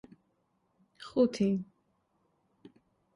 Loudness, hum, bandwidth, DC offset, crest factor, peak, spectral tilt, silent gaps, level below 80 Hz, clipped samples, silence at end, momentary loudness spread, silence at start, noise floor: -31 LUFS; none; 11.5 kHz; under 0.1%; 20 dB; -16 dBFS; -7 dB/octave; none; -72 dBFS; under 0.1%; 1.5 s; 23 LU; 1 s; -76 dBFS